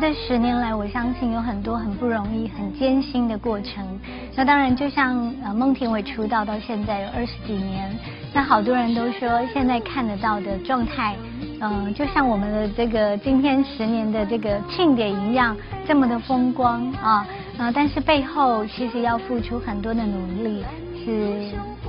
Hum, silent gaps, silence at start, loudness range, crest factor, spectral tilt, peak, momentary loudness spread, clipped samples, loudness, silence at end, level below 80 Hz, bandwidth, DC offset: none; none; 0 s; 3 LU; 20 dB; -9.5 dB/octave; -2 dBFS; 9 LU; under 0.1%; -22 LUFS; 0 s; -40 dBFS; 5.6 kHz; under 0.1%